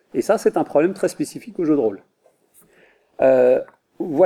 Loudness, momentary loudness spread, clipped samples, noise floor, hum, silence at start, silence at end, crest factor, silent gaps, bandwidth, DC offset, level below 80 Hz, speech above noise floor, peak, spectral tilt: -19 LUFS; 13 LU; under 0.1%; -56 dBFS; none; 0.15 s; 0 s; 16 dB; none; 14.5 kHz; under 0.1%; -64 dBFS; 38 dB; -4 dBFS; -6 dB/octave